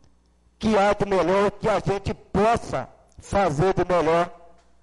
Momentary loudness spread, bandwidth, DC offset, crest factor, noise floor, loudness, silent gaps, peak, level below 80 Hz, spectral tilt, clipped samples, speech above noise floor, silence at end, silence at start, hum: 9 LU; 11.5 kHz; under 0.1%; 12 dB; -59 dBFS; -23 LUFS; none; -12 dBFS; -44 dBFS; -6 dB/octave; under 0.1%; 38 dB; 0.45 s; 0.6 s; none